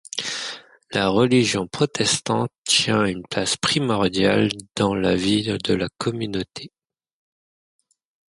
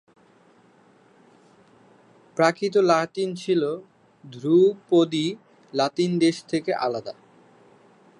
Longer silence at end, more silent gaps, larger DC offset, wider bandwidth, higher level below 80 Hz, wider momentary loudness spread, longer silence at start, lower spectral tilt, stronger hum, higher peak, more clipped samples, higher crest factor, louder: first, 1.65 s vs 1.1 s; first, 2.58-2.63 s vs none; neither; about the same, 11.5 kHz vs 11 kHz; first, -52 dBFS vs -74 dBFS; second, 10 LU vs 14 LU; second, 0.15 s vs 2.35 s; second, -4 dB/octave vs -5.5 dB/octave; neither; about the same, -4 dBFS vs -4 dBFS; neither; about the same, 18 dB vs 20 dB; about the same, -21 LUFS vs -23 LUFS